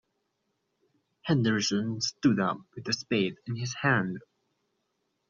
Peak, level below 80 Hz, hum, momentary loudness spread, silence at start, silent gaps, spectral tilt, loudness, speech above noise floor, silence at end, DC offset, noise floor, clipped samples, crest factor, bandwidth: -12 dBFS; -68 dBFS; none; 10 LU; 1.25 s; none; -4.5 dB/octave; -29 LUFS; 50 dB; 1.1 s; under 0.1%; -79 dBFS; under 0.1%; 20 dB; 7.4 kHz